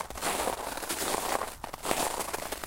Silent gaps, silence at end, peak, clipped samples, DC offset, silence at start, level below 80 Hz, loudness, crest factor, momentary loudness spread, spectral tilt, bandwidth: none; 0 s; -8 dBFS; under 0.1%; under 0.1%; 0 s; -52 dBFS; -32 LUFS; 24 dB; 5 LU; -1.5 dB/octave; 17 kHz